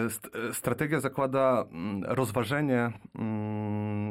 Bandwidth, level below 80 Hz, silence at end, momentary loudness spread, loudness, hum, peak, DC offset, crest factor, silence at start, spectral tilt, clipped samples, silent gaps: 16.5 kHz; -64 dBFS; 0 s; 8 LU; -30 LUFS; none; -14 dBFS; under 0.1%; 16 dB; 0 s; -6 dB/octave; under 0.1%; none